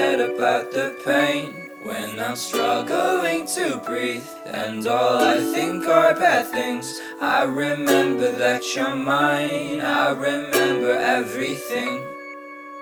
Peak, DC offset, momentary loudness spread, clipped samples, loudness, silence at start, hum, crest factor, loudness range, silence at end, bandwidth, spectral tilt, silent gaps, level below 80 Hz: -2 dBFS; under 0.1%; 11 LU; under 0.1%; -21 LUFS; 0 s; none; 20 dB; 3 LU; 0 s; over 20 kHz; -3.5 dB/octave; none; -66 dBFS